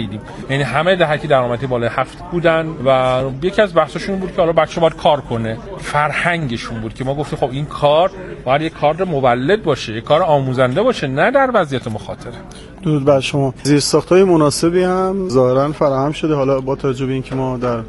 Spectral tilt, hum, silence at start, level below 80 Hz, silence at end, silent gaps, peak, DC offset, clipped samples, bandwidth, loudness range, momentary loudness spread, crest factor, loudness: -5.5 dB/octave; none; 0 s; -40 dBFS; 0 s; none; 0 dBFS; under 0.1%; under 0.1%; 11.5 kHz; 3 LU; 9 LU; 16 dB; -16 LUFS